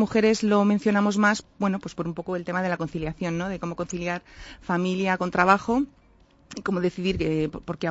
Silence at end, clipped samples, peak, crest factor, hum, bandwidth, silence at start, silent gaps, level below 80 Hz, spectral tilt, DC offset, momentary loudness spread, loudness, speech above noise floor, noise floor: 0 s; under 0.1%; -4 dBFS; 20 dB; none; 8 kHz; 0 s; none; -50 dBFS; -6 dB/octave; under 0.1%; 11 LU; -25 LUFS; 33 dB; -57 dBFS